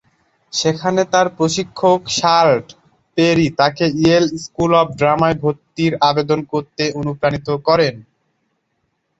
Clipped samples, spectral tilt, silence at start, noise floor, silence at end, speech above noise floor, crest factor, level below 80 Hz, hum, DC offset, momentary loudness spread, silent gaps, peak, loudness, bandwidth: under 0.1%; -5 dB/octave; 0.55 s; -69 dBFS; 1.15 s; 53 dB; 16 dB; -50 dBFS; none; under 0.1%; 7 LU; none; -2 dBFS; -16 LUFS; 8 kHz